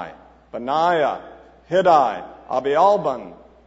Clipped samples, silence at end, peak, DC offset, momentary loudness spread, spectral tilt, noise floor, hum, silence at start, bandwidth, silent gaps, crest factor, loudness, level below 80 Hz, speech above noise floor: under 0.1%; 0.3 s; -4 dBFS; under 0.1%; 17 LU; -5.5 dB/octave; -41 dBFS; none; 0 s; 8 kHz; none; 18 dB; -19 LUFS; -56 dBFS; 22 dB